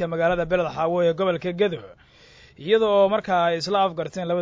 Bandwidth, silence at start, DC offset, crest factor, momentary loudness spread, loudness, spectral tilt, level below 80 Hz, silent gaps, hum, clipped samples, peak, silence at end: 7.8 kHz; 0 s; under 0.1%; 16 dB; 7 LU; -22 LUFS; -6 dB/octave; -52 dBFS; none; none; under 0.1%; -8 dBFS; 0 s